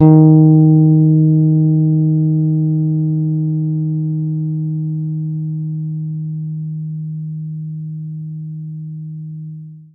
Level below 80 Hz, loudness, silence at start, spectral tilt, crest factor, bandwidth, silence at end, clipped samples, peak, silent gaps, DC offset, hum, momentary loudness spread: -56 dBFS; -15 LUFS; 0 s; -16 dB/octave; 14 dB; 1.3 kHz; 0.1 s; under 0.1%; 0 dBFS; none; under 0.1%; none; 18 LU